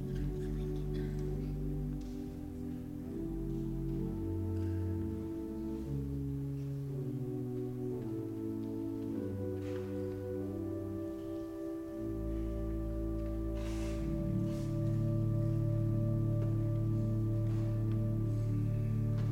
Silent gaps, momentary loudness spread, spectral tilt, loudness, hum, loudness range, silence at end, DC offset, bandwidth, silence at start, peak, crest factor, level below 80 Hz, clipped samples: none; 7 LU; -9.5 dB/octave; -37 LUFS; none; 6 LU; 0 s; under 0.1%; 15 kHz; 0 s; -22 dBFS; 14 dB; -44 dBFS; under 0.1%